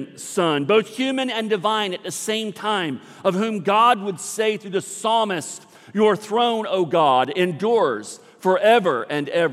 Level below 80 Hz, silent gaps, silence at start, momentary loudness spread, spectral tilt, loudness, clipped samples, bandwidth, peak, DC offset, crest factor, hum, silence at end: -78 dBFS; none; 0 s; 10 LU; -4 dB/octave; -21 LUFS; under 0.1%; 15 kHz; -4 dBFS; under 0.1%; 16 dB; none; 0 s